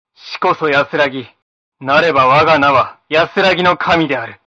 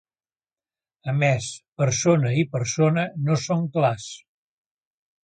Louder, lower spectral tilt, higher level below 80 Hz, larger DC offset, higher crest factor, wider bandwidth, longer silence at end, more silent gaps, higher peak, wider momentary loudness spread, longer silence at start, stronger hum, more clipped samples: first, -13 LUFS vs -22 LUFS; about the same, -5.5 dB/octave vs -5.5 dB/octave; first, -50 dBFS vs -60 dBFS; neither; second, 14 dB vs 20 dB; second, 7.8 kHz vs 9.2 kHz; second, 0.2 s vs 1.1 s; first, 1.42-1.72 s vs 1.68-1.72 s; first, 0 dBFS vs -6 dBFS; second, 9 LU vs 14 LU; second, 0.25 s vs 1.05 s; neither; neither